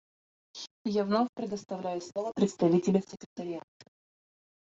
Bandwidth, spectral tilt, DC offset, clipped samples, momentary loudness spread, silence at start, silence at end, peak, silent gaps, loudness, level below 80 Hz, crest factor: 7.8 kHz; -6.5 dB/octave; under 0.1%; under 0.1%; 18 LU; 0.55 s; 1.05 s; -12 dBFS; 0.71-0.85 s, 1.29-1.33 s, 3.26-3.36 s; -31 LUFS; -72 dBFS; 20 dB